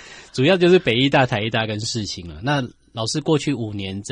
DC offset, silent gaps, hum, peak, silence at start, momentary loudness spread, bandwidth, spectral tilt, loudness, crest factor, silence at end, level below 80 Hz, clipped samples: under 0.1%; none; none; -4 dBFS; 0 s; 13 LU; 10.5 kHz; -5 dB/octave; -20 LUFS; 16 dB; 0 s; -50 dBFS; under 0.1%